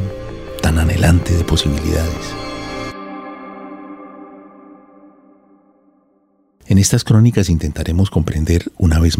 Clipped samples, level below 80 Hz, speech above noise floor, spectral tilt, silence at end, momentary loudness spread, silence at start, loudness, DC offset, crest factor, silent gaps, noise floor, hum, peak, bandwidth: under 0.1%; -30 dBFS; 44 dB; -5.5 dB/octave; 0 s; 20 LU; 0 s; -16 LUFS; under 0.1%; 16 dB; none; -58 dBFS; none; 0 dBFS; 16 kHz